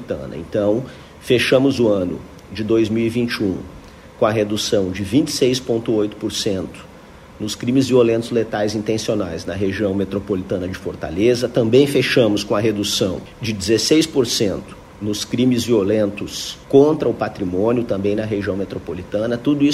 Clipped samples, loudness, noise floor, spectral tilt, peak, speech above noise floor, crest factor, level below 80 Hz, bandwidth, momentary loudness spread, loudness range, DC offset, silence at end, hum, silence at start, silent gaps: under 0.1%; -19 LUFS; -41 dBFS; -5 dB/octave; -2 dBFS; 23 dB; 18 dB; -46 dBFS; 15.5 kHz; 12 LU; 3 LU; under 0.1%; 0 s; none; 0 s; none